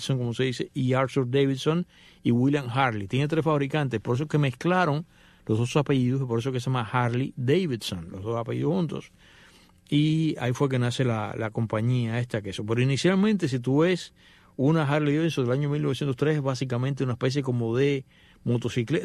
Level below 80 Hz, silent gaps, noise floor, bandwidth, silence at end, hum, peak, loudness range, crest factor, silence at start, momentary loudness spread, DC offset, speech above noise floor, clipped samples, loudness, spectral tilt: -60 dBFS; none; -55 dBFS; 12.5 kHz; 0 s; none; -8 dBFS; 3 LU; 16 dB; 0 s; 8 LU; under 0.1%; 30 dB; under 0.1%; -26 LUFS; -7 dB/octave